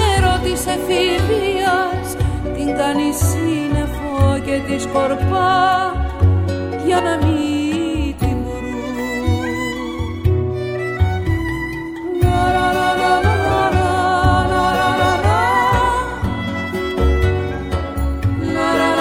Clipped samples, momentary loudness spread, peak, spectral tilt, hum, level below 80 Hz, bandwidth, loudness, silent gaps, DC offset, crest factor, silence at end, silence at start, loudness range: under 0.1%; 7 LU; -2 dBFS; -5.5 dB/octave; none; -28 dBFS; 16 kHz; -18 LUFS; none; under 0.1%; 14 dB; 0 s; 0 s; 5 LU